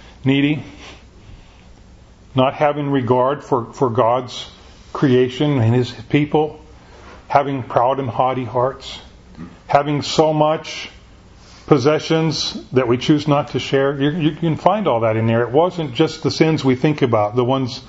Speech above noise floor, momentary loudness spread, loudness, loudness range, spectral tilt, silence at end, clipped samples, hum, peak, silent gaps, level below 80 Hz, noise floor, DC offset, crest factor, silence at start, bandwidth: 27 dB; 10 LU; -18 LUFS; 3 LU; -6.5 dB/octave; 0 s; under 0.1%; none; 0 dBFS; none; -48 dBFS; -44 dBFS; under 0.1%; 18 dB; 0.05 s; 8 kHz